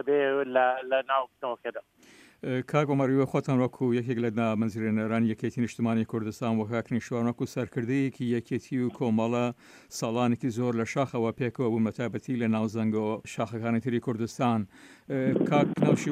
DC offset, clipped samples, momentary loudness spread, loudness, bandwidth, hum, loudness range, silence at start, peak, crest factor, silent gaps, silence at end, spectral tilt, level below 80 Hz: under 0.1%; under 0.1%; 8 LU; -28 LUFS; 14.5 kHz; none; 2 LU; 0 s; -8 dBFS; 18 dB; none; 0 s; -7 dB/octave; -68 dBFS